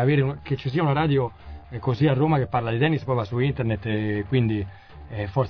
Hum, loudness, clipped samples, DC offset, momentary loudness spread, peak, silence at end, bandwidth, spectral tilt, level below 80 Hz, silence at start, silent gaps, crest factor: none; -24 LUFS; under 0.1%; 0.2%; 10 LU; -8 dBFS; 0 s; 5.4 kHz; -9.5 dB/octave; -46 dBFS; 0 s; none; 14 dB